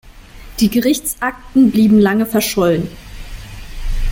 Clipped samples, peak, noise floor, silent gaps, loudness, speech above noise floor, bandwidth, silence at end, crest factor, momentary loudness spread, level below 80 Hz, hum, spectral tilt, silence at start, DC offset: under 0.1%; -2 dBFS; -36 dBFS; none; -14 LUFS; 23 dB; 17 kHz; 0 s; 14 dB; 23 LU; -28 dBFS; none; -5 dB/octave; 0.15 s; under 0.1%